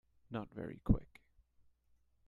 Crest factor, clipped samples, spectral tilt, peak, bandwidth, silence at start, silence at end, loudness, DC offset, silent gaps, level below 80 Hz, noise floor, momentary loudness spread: 26 dB; under 0.1%; -10 dB/octave; -16 dBFS; 4.4 kHz; 0.3 s; 1.25 s; -40 LUFS; under 0.1%; none; -48 dBFS; -74 dBFS; 11 LU